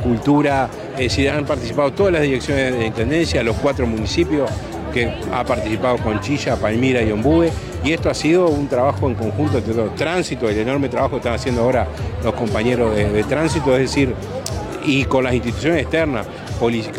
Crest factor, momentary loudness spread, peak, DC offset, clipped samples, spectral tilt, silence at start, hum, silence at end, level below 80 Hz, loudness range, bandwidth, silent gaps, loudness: 14 dB; 6 LU; -4 dBFS; under 0.1%; under 0.1%; -6 dB/octave; 0 s; none; 0 s; -34 dBFS; 2 LU; 16 kHz; none; -19 LUFS